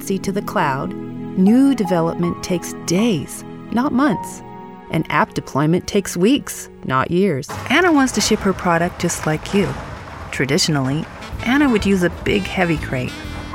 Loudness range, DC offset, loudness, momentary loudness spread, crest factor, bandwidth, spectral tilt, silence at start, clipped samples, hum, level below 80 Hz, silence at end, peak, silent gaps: 3 LU; under 0.1%; -18 LUFS; 14 LU; 16 dB; 17 kHz; -5 dB/octave; 0 s; under 0.1%; none; -40 dBFS; 0 s; -2 dBFS; none